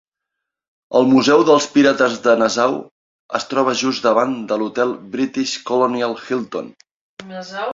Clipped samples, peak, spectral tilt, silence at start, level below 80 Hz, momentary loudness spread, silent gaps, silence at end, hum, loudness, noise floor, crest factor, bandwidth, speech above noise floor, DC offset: under 0.1%; 0 dBFS; -4 dB/octave; 0.9 s; -62 dBFS; 15 LU; 2.91-3.29 s, 6.91-7.17 s; 0 s; none; -17 LUFS; -81 dBFS; 18 dB; 7.8 kHz; 64 dB; under 0.1%